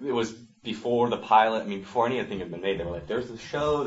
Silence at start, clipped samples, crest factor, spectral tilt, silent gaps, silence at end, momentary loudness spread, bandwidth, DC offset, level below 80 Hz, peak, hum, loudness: 0 s; under 0.1%; 20 dB; -5.5 dB/octave; none; 0 s; 13 LU; 8 kHz; under 0.1%; -54 dBFS; -8 dBFS; none; -27 LUFS